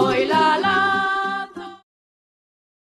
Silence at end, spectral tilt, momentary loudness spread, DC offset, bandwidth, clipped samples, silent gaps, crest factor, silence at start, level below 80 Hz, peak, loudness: 1.15 s; -4.5 dB/octave; 18 LU; under 0.1%; 13 kHz; under 0.1%; none; 14 dB; 0 s; -60 dBFS; -6 dBFS; -19 LUFS